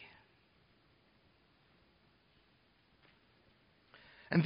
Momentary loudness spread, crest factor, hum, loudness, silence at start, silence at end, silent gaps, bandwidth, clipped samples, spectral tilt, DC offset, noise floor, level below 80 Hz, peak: 11 LU; 26 dB; none; -41 LUFS; 0 s; 0 s; none; 5.2 kHz; under 0.1%; -6.5 dB/octave; under 0.1%; -71 dBFS; -78 dBFS; -18 dBFS